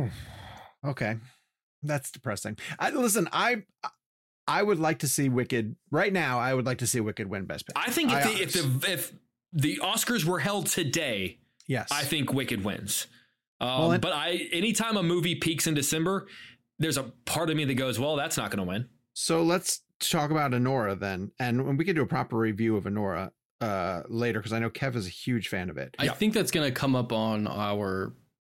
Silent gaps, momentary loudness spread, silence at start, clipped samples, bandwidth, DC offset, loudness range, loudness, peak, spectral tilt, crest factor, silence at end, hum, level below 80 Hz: 1.63-1.82 s, 4.06-4.47 s, 13.47-13.60 s, 19.95-20.00 s, 23.45-23.59 s; 10 LU; 0 s; under 0.1%; 16.5 kHz; under 0.1%; 3 LU; -28 LUFS; -12 dBFS; -4 dB/octave; 16 dB; 0.25 s; none; -62 dBFS